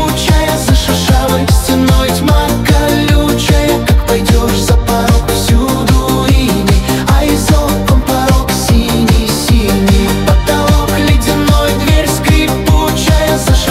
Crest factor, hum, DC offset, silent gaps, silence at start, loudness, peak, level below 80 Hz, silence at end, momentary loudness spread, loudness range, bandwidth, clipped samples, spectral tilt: 10 dB; none; under 0.1%; none; 0 s; -10 LUFS; 0 dBFS; -14 dBFS; 0 s; 1 LU; 0 LU; 16.5 kHz; under 0.1%; -5 dB/octave